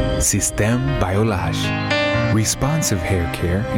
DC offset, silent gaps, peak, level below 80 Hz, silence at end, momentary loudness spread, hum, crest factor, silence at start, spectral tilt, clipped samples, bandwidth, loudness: under 0.1%; none; -4 dBFS; -32 dBFS; 0 s; 4 LU; none; 14 dB; 0 s; -4.5 dB/octave; under 0.1%; 17.5 kHz; -19 LUFS